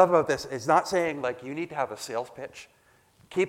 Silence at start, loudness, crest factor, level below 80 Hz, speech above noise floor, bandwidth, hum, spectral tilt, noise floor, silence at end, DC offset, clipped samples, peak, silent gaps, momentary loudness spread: 0 s; -28 LUFS; 22 dB; -64 dBFS; 34 dB; 16 kHz; none; -5 dB/octave; -61 dBFS; 0 s; under 0.1%; under 0.1%; -4 dBFS; none; 17 LU